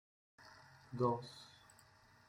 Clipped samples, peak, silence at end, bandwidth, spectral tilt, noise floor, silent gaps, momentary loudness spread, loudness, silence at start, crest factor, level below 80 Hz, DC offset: under 0.1%; -24 dBFS; 0.8 s; 16 kHz; -7 dB/octave; -67 dBFS; none; 25 LU; -41 LUFS; 0.4 s; 22 dB; -78 dBFS; under 0.1%